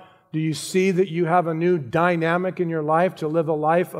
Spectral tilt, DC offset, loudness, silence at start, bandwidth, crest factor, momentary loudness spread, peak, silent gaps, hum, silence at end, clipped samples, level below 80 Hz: -6.5 dB/octave; under 0.1%; -22 LUFS; 0 s; 16 kHz; 16 dB; 5 LU; -4 dBFS; none; none; 0 s; under 0.1%; -68 dBFS